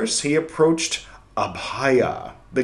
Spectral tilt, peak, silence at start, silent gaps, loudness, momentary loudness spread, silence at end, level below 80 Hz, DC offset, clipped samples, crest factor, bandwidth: -3.5 dB/octave; -4 dBFS; 0 s; none; -22 LUFS; 10 LU; 0 s; -52 dBFS; under 0.1%; under 0.1%; 16 dB; 12.5 kHz